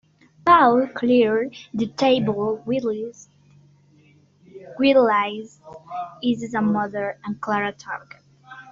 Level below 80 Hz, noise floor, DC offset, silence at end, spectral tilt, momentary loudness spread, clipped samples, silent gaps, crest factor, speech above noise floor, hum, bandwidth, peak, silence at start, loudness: -60 dBFS; -55 dBFS; under 0.1%; 0 s; -4 dB/octave; 18 LU; under 0.1%; none; 18 dB; 34 dB; none; 7.6 kHz; -4 dBFS; 0.45 s; -21 LUFS